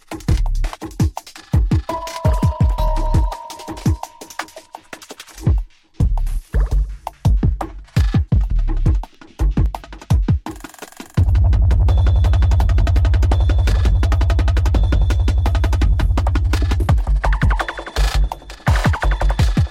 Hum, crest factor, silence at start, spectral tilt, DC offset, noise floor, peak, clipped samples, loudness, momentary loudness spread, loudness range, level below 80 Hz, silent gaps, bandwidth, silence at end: none; 12 dB; 0.1 s; -6.5 dB/octave; under 0.1%; -39 dBFS; -4 dBFS; under 0.1%; -19 LUFS; 15 LU; 7 LU; -18 dBFS; none; 13.5 kHz; 0 s